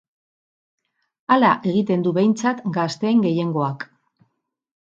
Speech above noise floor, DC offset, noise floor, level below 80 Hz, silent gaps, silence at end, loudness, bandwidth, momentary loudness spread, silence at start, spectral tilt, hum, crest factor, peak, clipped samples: 55 dB; under 0.1%; -74 dBFS; -68 dBFS; none; 1 s; -20 LUFS; 7.8 kHz; 11 LU; 1.3 s; -6.5 dB/octave; none; 18 dB; -2 dBFS; under 0.1%